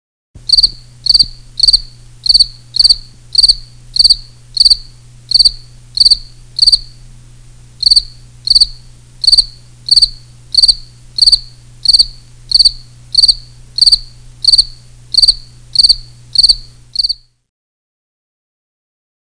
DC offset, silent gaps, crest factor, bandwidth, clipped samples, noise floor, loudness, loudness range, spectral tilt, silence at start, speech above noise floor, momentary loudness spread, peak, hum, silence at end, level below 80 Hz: 0.5%; none; 14 dB; 10.5 kHz; under 0.1%; -37 dBFS; -8 LUFS; 2 LU; 0.5 dB/octave; 0.5 s; 24 dB; 10 LU; 0 dBFS; 60 Hz at -40 dBFS; 2.1 s; -32 dBFS